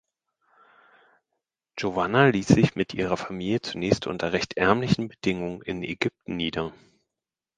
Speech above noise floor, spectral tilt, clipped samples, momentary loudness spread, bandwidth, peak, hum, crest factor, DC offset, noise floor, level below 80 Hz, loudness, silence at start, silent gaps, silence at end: 64 dB; -6 dB/octave; under 0.1%; 12 LU; 9.6 kHz; 0 dBFS; none; 26 dB; under 0.1%; -88 dBFS; -52 dBFS; -25 LUFS; 1.75 s; none; 0.85 s